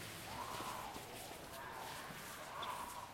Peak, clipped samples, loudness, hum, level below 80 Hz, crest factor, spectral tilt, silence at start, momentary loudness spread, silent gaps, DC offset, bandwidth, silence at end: -34 dBFS; under 0.1%; -47 LUFS; none; -68 dBFS; 16 dB; -2.5 dB/octave; 0 s; 5 LU; none; under 0.1%; 16.5 kHz; 0 s